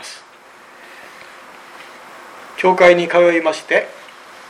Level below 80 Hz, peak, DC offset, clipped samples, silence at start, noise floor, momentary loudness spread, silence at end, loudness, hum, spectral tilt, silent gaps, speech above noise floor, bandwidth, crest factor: -64 dBFS; 0 dBFS; under 0.1%; under 0.1%; 0 s; -43 dBFS; 27 LU; 0.6 s; -14 LUFS; none; -4.5 dB/octave; none; 30 dB; 12 kHz; 18 dB